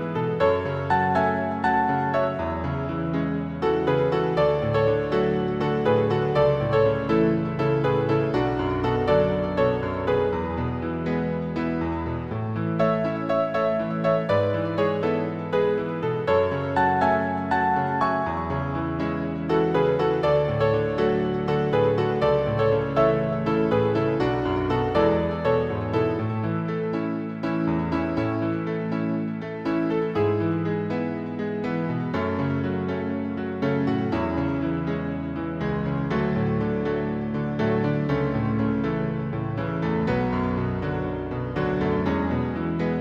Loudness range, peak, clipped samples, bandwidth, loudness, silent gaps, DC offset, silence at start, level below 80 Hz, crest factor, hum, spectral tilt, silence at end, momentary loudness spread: 4 LU; -8 dBFS; under 0.1%; 7.4 kHz; -24 LUFS; none; 0.1%; 0 s; -44 dBFS; 16 dB; none; -9 dB/octave; 0 s; 6 LU